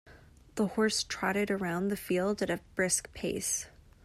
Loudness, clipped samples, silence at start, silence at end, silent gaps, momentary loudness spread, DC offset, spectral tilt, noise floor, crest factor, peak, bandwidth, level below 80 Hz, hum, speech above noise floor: -31 LUFS; under 0.1%; 0.05 s; 0.35 s; none; 5 LU; under 0.1%; -3.5 dB/octave; -56 dBFS; 16 dB; -16 dBFS; 15.5 kHz; -58 dBFS; none; 24 dB